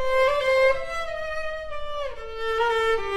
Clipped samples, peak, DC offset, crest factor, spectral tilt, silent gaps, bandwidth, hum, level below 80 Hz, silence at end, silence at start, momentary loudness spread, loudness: under 0.1%; -10 dBFS; under 0.1%; 14 dB; -2.5 dB/octave; none; 14.5 kHz; none; -42 dBFS; 0 s; 0 s; 13 LU; -25 LUFS